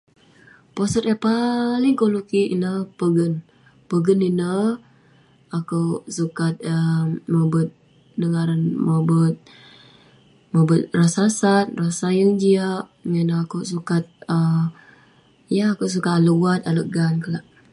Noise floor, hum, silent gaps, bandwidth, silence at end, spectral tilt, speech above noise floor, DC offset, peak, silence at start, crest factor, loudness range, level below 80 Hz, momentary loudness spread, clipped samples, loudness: -54 dBFS; none; none; 11.5 kHz; 0.3 s; -7 dB/octave; 35 dB; under 0.1%; -4 dBFS; 0.75 s; 16 dB; 4 LU; -60 dBFS; 9 LU; under 0.1%; -21 LUFS